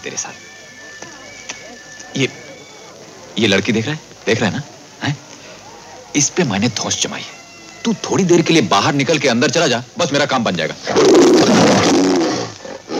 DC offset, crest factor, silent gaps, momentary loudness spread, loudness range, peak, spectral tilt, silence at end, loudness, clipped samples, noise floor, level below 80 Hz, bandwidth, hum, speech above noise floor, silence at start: under 0.1%; 16 dB; none; 24 LU; 8 LU; 0 dBFS; -4 dB/octave; 0 s; -15 LUFS; under 0.1%; -38 dBFS; -56 dBFS; 15 kHz; none; 23 dB; 0 s